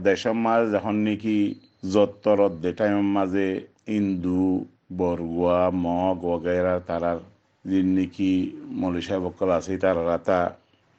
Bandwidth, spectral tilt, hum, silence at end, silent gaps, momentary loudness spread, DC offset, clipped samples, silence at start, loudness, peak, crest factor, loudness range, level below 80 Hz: 8 kHz; -7 dB/octave; none; 0.45 s; none; 7 LU; under 0.1%; under 0.1%; 0 s; -24 LUFS; -6 dBFS; 18 dB; 2 LU; -56 dBFS